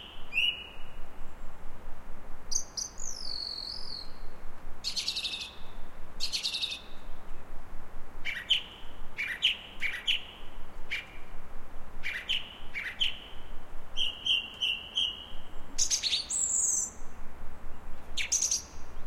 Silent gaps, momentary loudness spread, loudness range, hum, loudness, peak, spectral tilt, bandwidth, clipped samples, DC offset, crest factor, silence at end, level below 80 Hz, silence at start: none; 22 LU; 7 LU; none; -31 LUFS; -14 dBFS; 0.5 dB/octave; 13.5 kHz; under 0.1%; under 0.1%; 16 dB; 0 s; -42 dBFS; 0 s